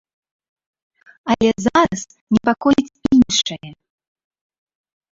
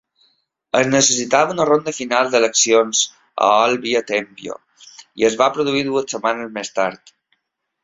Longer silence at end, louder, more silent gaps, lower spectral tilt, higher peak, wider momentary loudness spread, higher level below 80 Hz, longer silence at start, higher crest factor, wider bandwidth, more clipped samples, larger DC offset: first, 1.4 s vs 0.9 s; about the same, -17 LUFS vs -17 LUFS; first, 2.21-2.27 s vs none; first, -4 dB/octave vs -2.5 dB/octave; about the same, -2 dBFS vs -2 dBFS; about the same, 12 LU vs 11 LU; first, -48 dBFS vs -62 dBFS; first, 1.25 s vs 0.75 s; about the same, 18 dB vs 18 dB; about the same, 7.8 kHz vs 7.8 kHz; neither; neither